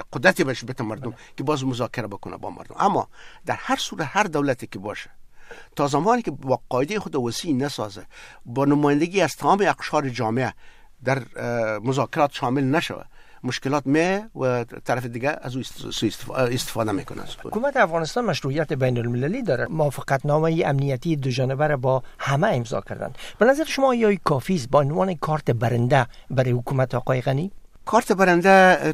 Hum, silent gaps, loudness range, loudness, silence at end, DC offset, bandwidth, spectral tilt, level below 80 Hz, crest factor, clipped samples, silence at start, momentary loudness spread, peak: none; none; 4 LU; -22 LUFS; 0 s; under 0.1%; 15.5 kHz; -6 dB/octave; -48 dBFS; 20 dB; under 0.1%; 0 s; 12 LU; -2 dBFS